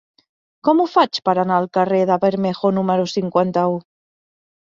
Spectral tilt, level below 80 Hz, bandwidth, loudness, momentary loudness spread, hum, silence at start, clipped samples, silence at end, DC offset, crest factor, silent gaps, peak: -7 dB/octave; -64 dBFS; 7.6 kHz; -18 LUFS; 4 LU; none; 0.65 s; under 0.1%; 0.9 s; under 0.1%; 18 dB; none; -2 dBFS